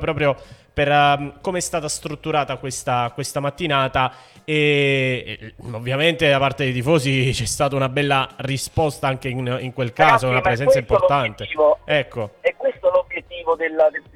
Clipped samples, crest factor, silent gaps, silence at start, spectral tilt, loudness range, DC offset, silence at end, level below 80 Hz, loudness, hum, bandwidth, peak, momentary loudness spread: under 0.1%; 18 dB; none; 0 s; -4.5 dB/octave; 3 LU; under 0.1%; 0.15 s; -44 dBFS; -20 LUFS; none; 16 kHz; -2 dBFS; 10 LU